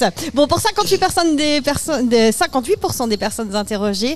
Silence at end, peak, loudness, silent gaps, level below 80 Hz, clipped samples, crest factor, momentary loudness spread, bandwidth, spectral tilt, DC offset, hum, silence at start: 0 s; -4 dBFS; -17 LUFS; none; -40 dBFS; under 0.1%; 14 dB; 6 LU; 15 kHz; -3.5 dB/octave; 2%; none; 0 s